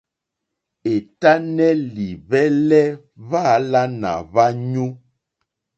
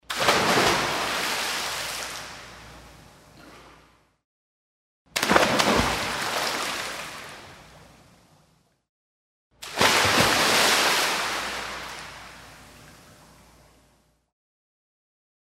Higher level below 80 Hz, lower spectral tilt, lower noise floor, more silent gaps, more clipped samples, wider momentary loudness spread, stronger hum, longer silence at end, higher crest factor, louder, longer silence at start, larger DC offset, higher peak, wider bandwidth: second, -56 dBFS vs -50 dBFS; first, -7 dB/octave vs -2 dB/octave; first, -81 dBFS vs -63 dBFS; second, none vs 4.24-5.05 s, 8.89-9.51 s; neither; second, 11 LU vs 22 LU; neither; second, 0.8 s vs 2.55 s; second, 18 dB vs 26 dB; first, -18 LUFS vs -22 LUFS; first, 0.85 s vs 0.1 s; neither; about the same, 0 dBFS vs -2 dBFS; second, 8 kHz vs 16 kHz